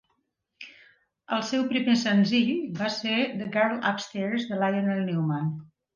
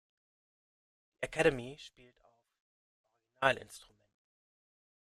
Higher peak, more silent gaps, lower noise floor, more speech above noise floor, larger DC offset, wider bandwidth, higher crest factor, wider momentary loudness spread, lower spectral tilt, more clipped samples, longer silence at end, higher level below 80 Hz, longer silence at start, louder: about the same, -10 dBFS vs -10 dBFS; second, none vs 2.60-3.04 s; second, -75 dBFS vs under -90 dBFS; second, 50 dB vs over 56 dB; neither; second, 7.4 kHz vs 13.5 kHz; second, 18 dB vs 30 dB; second, 11 LU vs 22 LU; about the same, -5.5 dB/octave vs -4.5 dB/octave; neither; second, 0.3 s vs 1.2 s; second, -72 dBFS vs -64 dBFS; second, 0.6 s vs 1.2 s; first, -26 LUFS vs -33 LUFS